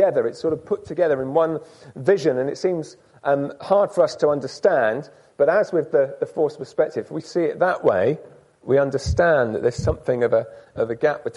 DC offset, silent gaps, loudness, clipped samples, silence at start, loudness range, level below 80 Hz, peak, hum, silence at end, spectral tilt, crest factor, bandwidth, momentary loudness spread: under 0.1%; none; -21 LUFS; under 0.1%; 0 s; 2 LU; -44 dBFS; -6 dBFS; none; 0.05 s; -6.5 dB/octave; 16 dB; 11.5 kHz; 9 LU